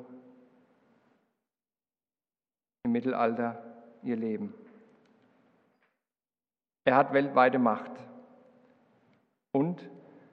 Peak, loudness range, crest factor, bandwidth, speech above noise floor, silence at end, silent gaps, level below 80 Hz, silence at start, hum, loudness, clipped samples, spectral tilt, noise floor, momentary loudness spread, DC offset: -8 dBFS; 10 LU; 24 dB; 5.4 kHz; over 62 dB; 0.35 s; none; -82 dBFS; 0 s; none; -29 LUFS; under 0.1%; -9 dB/octave; under -90 dBFS; 23 LU; under 0.1%